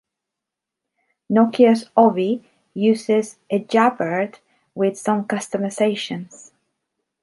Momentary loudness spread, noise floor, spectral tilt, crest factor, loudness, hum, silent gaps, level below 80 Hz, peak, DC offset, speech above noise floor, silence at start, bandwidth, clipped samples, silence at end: 13 LU; -84 dBFS; -5.5 dB/octave; 18 dB; -19 LUFS; none; none; -72 dBFS; -2 dBFS; under 0.1%; 66 dB; 1.3 s; 11.5 kHz; under 0.1%; 0.95 s